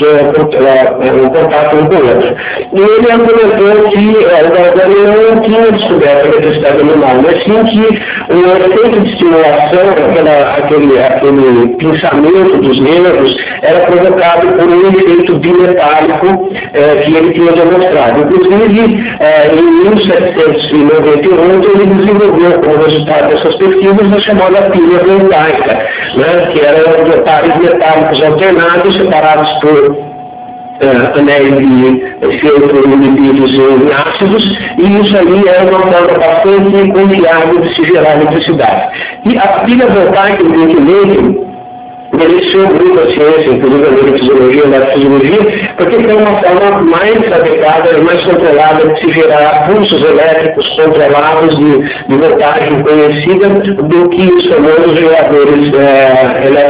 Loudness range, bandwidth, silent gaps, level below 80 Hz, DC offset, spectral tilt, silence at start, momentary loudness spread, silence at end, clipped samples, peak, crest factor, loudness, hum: 1 LU; 4 kHz; none; -40 dBFS; under 0.1%; -10 dB/octave; 0 s; 4 LU; 0 s; 8%; 0 dBFS; 6 dB; -6 LUFS; none